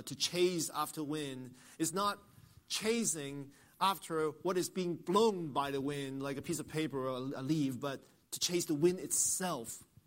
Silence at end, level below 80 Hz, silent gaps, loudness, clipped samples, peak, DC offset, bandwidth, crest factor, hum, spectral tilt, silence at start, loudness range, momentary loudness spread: 0.25 s; -72 dBFS; none; -35 LUFS; under 0.1%; -16 dBFS; under 0.1%; 16 kHz; 20 dB; none; -3.5 dB/octave; 0 s; 3 LU; 12 LU